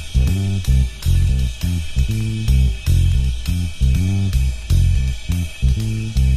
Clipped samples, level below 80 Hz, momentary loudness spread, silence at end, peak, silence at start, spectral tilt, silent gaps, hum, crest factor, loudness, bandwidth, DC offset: under 0.1%; -20 dBFS; 5 LU; 0 s; -4 dBFS; 0 s; -6 dB/octave; none; none; 12 dB; -19 LUFS; 14.5 kHz; under 0.1%